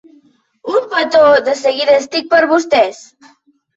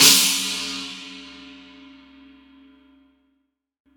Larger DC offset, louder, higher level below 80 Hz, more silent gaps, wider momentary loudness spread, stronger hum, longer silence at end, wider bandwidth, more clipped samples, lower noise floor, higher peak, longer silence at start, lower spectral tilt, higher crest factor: neither; first, -13 LUFS vs -18 LUFS; about the same, -58 dBFS vs -62 dBFS; neither; second, 8 LU vs 28 LU; neither; second, 0.8 s vs 2.45 s; second, 8 kHz vs over 20 kHz; neither; second, -51 dBFS vs -72 dBFS; about the same, -2 dBFS vs 0 dBFS; first, 0.65 s vs 0 s; first, -2.5 dB/octave vs 0.5 dB/octave; second, 12 dB vs 24 dB